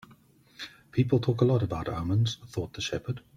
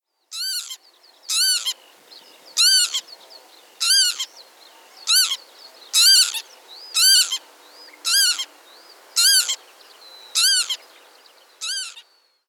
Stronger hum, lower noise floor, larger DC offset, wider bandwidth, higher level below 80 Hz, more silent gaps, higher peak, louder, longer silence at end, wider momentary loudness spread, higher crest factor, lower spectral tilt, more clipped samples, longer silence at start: neither; first, -58 dBFS vs -53 dBFS; neither; second, 11 kHz vs over 20 kHz; first, -54 dBFS vs under -90 dBFS; neither; second, -10 dBFS vs -4 dBFS; second, -29 LUFS vs -17 LUFS; second, 0.2 s vs 0.5 s; second, 14 LU vs 18 LU; about the same, 20 dB vs 18 dB; first, -6.5 dB/octave vs 7.5 dB/octave; neither; first, 0.6 s vs 0.3 s